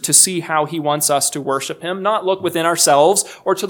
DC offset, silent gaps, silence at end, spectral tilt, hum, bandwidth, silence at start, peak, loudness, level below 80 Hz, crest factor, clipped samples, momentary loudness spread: under 0.1%; none; 0 s; -2 dB/octave; none; 19 kHz; 0 s; 0 dBFS; -16 LUFS; -70 dBFS; 16 dB; under 0.1%; 10 LU